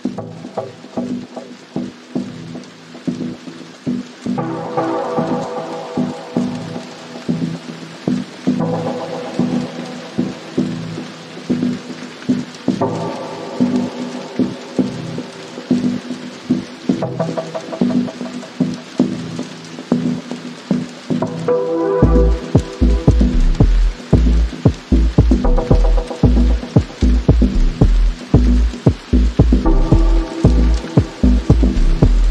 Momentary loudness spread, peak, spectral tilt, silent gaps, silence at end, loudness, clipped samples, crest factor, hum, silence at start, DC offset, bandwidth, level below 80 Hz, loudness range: 14 LU; 0 dBFS; -7.5 dB/octave; none; 0 s; -18 LUFS; under 0.1%; 16 dB; none; 0.05 s; under 0.1%; 9 kHz; -20 dBFS; 7 LU